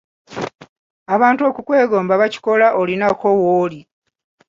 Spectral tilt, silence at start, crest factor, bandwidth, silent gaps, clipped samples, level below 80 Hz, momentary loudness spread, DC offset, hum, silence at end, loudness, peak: -6.5 dB/octave; 0.3 s; 16 dB; 7.6 kHz; 0.55-0.59 s, 0.69-1.06 s; under 0.1%; -60 dBFS; 14 LU; under 0.1%; none; 0.7 s; -16 LUFS; -2 dBFS